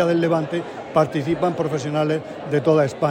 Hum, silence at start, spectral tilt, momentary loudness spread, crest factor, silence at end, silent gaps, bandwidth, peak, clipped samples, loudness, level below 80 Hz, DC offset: none; 0 s; -7 dB/octave; 7 LU; 16 dB; 0 s; none; 15.5 kHz; -4 dBFS; under 0.1%; -21 LUFS; -58 dBFS; under 0.1%